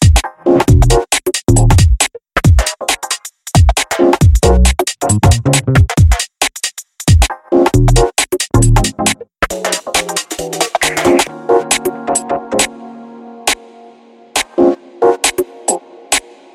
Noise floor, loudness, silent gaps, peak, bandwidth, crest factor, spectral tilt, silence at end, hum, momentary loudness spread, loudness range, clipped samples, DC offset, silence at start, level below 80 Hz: -41 dBFS; -13 LUFS; none; 0 dBFS; 16.5 kHz; 12 dB; -4.5 dB/octave; 0.35 s; none; 9 LU; 5 LU; under 0.1%; under 0.1%; 0 s; -18 dBFS